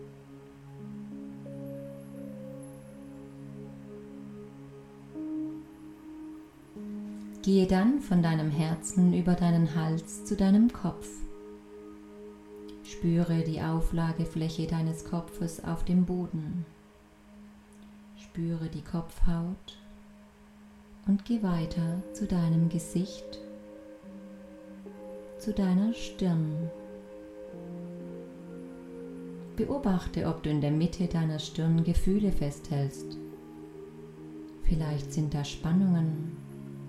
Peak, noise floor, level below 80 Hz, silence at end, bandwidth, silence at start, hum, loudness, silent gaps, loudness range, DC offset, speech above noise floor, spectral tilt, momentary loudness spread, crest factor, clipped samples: -12 dBFS; -56 dBFS; -42 dBFS; 0 s; 12.5 kHz; 0 s; none; -30 LUFS; none; 15 LU; under 0.1%; 28 dB; -7.5 dB/octave; 21 LU; 18 dB; under 0.1%